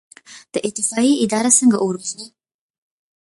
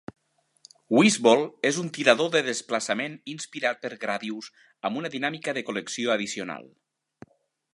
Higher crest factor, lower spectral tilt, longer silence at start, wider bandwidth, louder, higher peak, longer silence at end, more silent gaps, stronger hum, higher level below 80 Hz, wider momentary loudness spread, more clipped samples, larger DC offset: second, 18 dB vs 26 dB; about the same, -3 dB/octave vs -3.5 dB/octave; second, 0.3 s vs 0.9 s; about the same, 11.5 kHz vs 11.5 kHz; first, -17 LUFS vs -25 LUFS; about the same, -2 dBFS vs -2 dBFS; second, 0.95 s vs 1.1 s; neither; neither; first, -66 dBFS vs -76 dBFS; about the same, 15 LU vs 15 LU; neither; neither